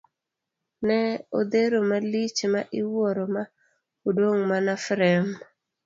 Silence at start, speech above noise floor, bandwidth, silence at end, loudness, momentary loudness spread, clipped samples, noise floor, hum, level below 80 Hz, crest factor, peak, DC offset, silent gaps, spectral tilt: 0.8 s; 61 dB; 7.8 kHz; 0.45 s; -25 LUFS; 9 LU; under 0.1%; -85 dBFS; none; -70 dBFS; 18 dB; -8 dBFS; under 0.1%; none; -5.5 dB/octave